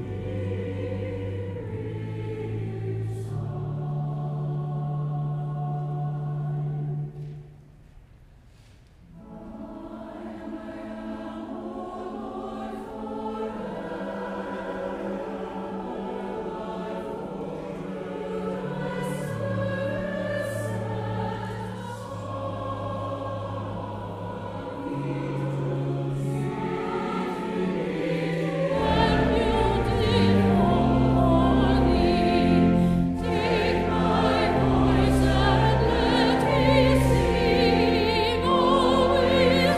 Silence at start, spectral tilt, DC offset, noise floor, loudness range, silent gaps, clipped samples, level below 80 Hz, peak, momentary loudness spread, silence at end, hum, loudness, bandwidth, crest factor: 0 s; -7 dB/octave; under 0.1%; -52 dBFS; 15 LU; none; under 0.1%; -38 dBFS; -8 dBFS; 15 LU; 0 s; none; -26 LUFS; 15 kHz; 18 dB